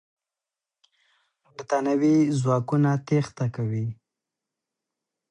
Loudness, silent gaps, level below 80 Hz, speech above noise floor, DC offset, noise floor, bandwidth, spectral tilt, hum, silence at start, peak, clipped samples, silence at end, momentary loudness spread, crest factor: -24 LUFS; none; -66 dBFS; 66 dB; under 0.1%; -89 dBFS; 10 kHz; -8 dB/octave; none; 1.6 s; -12 dBFS; under 0.1%; 1.4 s; 10 LU; 16 dB